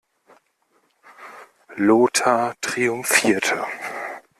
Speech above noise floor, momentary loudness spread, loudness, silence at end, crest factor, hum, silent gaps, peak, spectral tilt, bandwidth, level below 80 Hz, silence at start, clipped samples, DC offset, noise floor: 46 dB; 23 LU; -20 LUFS; 0.2 s; 20 dB; none; none; -2 dBFS; -3 dB/octave; 15 kHz; -66 dBFS; 1.2 s; under 0.1%; under 0.1%; -65 dBFS